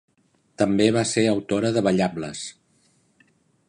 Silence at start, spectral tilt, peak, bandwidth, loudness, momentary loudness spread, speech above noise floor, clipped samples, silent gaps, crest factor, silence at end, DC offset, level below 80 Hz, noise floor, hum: 0.6 s; -5 dB/octave; -4 dBFS; 11 kHz; -22 LUFS; 13 LU; 43 dB; under 0.1%; none; 20 dB; 1.2 s; under 0.1%; -58 dBFS; -65 dBFS; none